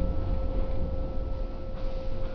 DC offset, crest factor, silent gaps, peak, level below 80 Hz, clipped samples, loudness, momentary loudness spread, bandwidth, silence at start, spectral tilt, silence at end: under 0.1%; 12 dB; none; -16 dBFS; -30 dBFS; under 0.1%; -35 LUFS; 5 LU; 5.4 kHz; 0 s; -9.5 dB/octave; 0 s